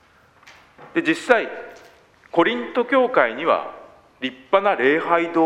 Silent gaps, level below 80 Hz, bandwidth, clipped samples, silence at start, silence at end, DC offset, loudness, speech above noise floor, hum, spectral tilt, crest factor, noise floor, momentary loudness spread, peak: none; -66 dBFS; 11 kHz; under 0.1%; 0.45 s; 0 s; under 0.1%; -20 LUFS; 32 dB; none; -5 dB/octave; 22 dB; -52 dBFS; 13 LU; 0 dBFS